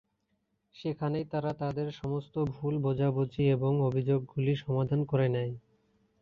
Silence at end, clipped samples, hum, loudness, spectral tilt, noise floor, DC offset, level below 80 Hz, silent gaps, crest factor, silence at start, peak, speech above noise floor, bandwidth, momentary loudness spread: 0.65 s; under 0.1%; none; -31 LUFS; -9.5 dB/octave; -78 dBFS; under 0.1%; -60 dBFS; none; 16 dB; 0.75 s; -16 dBFS; 48 dB; 6 kHz; 7 LU